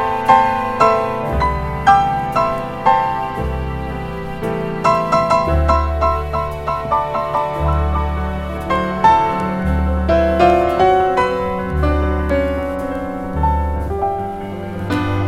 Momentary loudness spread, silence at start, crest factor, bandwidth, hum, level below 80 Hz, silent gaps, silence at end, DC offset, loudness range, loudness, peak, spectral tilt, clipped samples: 10 LU; 0 s; 16 dB; 13.5 kHz; none; -24 dBFS; none; 0 s; under 0.1%; 4 LU; -17 LUFS; 0 dBFS; -7 dB/octave; under 0.1%